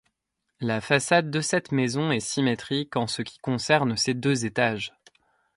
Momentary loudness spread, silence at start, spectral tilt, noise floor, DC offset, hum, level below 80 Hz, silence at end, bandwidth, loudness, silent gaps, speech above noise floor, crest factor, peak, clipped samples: 8 LU; 0.6 s; -4.5 dB/octave; -80 dBFS; under 0.1%; none; -62 dBFS; 0.7 s; 11.5 kHz; -25 LUFS; none; 55 dB; 20 dB; -6 dBFS; under 0.1%